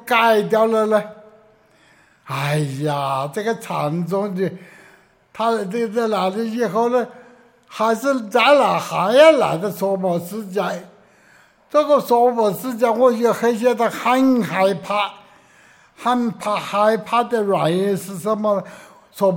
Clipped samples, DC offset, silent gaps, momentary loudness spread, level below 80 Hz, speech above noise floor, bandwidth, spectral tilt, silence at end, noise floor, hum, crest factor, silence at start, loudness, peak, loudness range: under 0.1%; under 0.1%; none; 9 LU; -68 dBFS; 36 dB; 17 kHz; -5.5 dB/octave; 0 s; -54 dBFS; none; 18 dB; 0.05 s; -18 LUFS; -2 dBFS; 7 LU